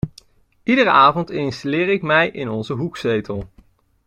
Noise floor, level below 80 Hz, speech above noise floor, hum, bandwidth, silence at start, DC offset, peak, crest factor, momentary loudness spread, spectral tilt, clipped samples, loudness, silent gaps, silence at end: -53 dBFS; -48 dBFS; 35 dB; none; 11 kHz; 0.05 s; under 0.1%; -2 dBFS; 18 dB; 16 LU; -6.5 dB/octave; under 0.1%; -18 LUFS; none; 0.6 s